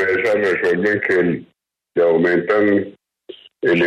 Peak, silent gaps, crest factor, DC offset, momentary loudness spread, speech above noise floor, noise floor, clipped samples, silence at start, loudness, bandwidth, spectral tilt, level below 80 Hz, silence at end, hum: -4 dBFS; none; 14 dB; under 0.1%; 8 LU; 25 dB; -41 dBFS; under 0.1%; 0 s; -17 LUFS; 9.6 kHz; -7 dB/octave; -58 dBFS; 0 s; none